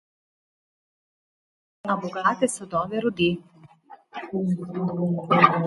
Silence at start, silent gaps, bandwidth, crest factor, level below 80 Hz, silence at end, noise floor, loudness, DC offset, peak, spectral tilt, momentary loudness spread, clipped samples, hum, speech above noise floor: 1.85 s; none; 11.5 kHz; 26 dB; -62 dBFS; 0 s; -50 dBFS; -25 LUFS; under 0.1%; 0 dBFS; -5.5 dB/octave; 13 LU; under 0.1%; none; 26 dB